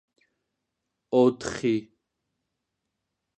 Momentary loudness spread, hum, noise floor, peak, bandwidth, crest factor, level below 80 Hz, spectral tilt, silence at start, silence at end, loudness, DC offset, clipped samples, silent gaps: 7 LU; none; -82 dBFS; -10 dBFS; 9 kHz; 20 dB; -64 dBFS; -6 dB/octave; 1.1 s; 1.55 s; -25 LUFS; under 0.1%; under 0.1%; none